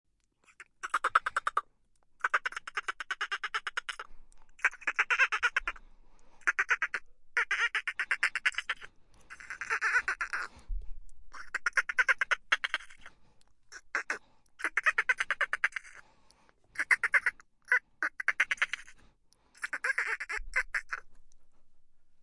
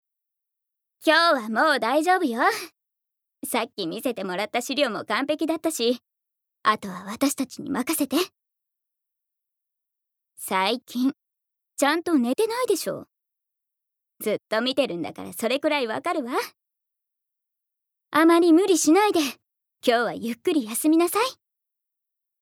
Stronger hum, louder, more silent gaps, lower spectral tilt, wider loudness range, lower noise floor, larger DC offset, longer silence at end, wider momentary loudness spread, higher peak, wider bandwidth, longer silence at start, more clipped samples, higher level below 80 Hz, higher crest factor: neither; second, -31 LUFS vs -23 LUFS; neither; second, 0 dB/octave vs -3 dB/octave; second, 4 LU vs 8 LU; second, -68 dBFS vs -84 dBFS; neither; second, 0 s vs 1.1 s; first, 14 LU vs 11 LU; second, -10 dBFS vs -6 dBFS; second, 11.5 kHz vs 18.5 kHz; second, 0.6 s vs 1 s; neither; first, -54 dBFS vs -78 dBFS; about the same, 24 dB vs 20 dB